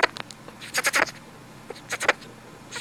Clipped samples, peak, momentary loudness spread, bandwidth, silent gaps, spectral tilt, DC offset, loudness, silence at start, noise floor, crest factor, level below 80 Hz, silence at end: under 0.1%; -2 dBFS; 22 LU; over 20 kHz; none; -1 dB/octave; under 0.1%; -25 LUFS; 0 s; -45 dBFS; 28 dB; -64 dBFS; 0 s